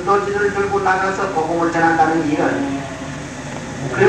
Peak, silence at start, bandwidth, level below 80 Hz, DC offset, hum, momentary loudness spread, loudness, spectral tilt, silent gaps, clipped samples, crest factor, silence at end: 0 dBFS; 0 s; 11.5 kHz; -46 dBFS; 0.2%; none; 13 LU; -18 LUFS; -5.5 dB/octave; none; under 0.1%; 18 dB; 0 s